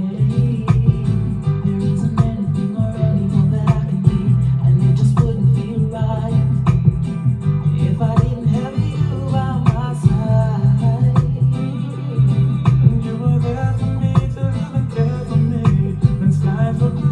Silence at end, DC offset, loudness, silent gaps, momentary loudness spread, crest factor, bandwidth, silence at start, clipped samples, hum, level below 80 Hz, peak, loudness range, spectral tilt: 0 s; under 0.1%; -17 LUFS; none; 5 LU; 16 dB; 9.2 kHz; 0 s; under 0.1%; none; -32 dBFS; 0 dBFS; 2 LU; -9.5 dB/octave